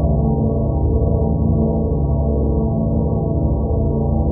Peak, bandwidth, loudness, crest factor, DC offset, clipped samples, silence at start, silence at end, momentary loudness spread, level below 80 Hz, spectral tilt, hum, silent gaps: -6 dBFS; 1.3 kHz; -18 LUFS; 12 dB; under 0.1%; under 0.1%; 0 s; 0 s; 2 LU; -22 dBFS; -8 dB/octave; none; none